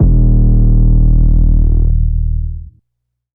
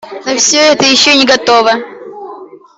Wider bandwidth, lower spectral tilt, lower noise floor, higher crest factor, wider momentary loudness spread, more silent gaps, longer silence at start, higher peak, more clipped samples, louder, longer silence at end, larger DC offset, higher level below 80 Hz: second, 1.1 kHz vs 8.4 kHz; first, -18 dB/octave vs -1 dB/octave; first, -72 dBFS vs -31 dBFS; about the same, 10 dB vs 10 dB; second, 9 LU vs 22 LU; neither; about the same, 0 s vs 0.05 s; about the same, 0 dBFS vs 0 dBFS; neither; second, -13 LUFS vs -8 LUFS; first, 0.65 s vs 0.2 s; neither; first, -10 dBFS vs -52 dBFS